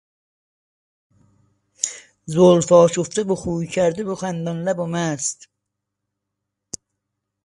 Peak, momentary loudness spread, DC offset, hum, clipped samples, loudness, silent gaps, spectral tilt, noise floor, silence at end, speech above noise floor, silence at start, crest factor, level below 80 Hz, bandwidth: 0 dBFS; 22 LU; under 0.1%; 50 Hz at -60 dBFS; under 0.1%; -19 LUFS; none; -5.5 dB/octave; -80 dBFS; 2.1 s; 62 dB; 1.85 s; 22 dB; -56 dBFS; 11.5 kHz